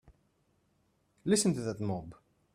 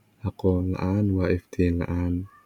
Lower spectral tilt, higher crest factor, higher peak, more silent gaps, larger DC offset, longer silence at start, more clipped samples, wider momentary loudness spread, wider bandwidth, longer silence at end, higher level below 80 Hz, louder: second, -5 dB/octave vs -9.5 dB/octave; about the same, 20 dB vs 16 dB; second, -16 dBFS vs -10 dBFS; neither; neither; first, 1.25 s vs 0.25 s; neither; first, 13 LU vs 4 LU; first, 14 kHz vs 6.8 kHz; first, 0.4 s vs 0.2 s; second, -66 dBFS vs -42 dBFS; second, -32 LUFS vs -26 LUFS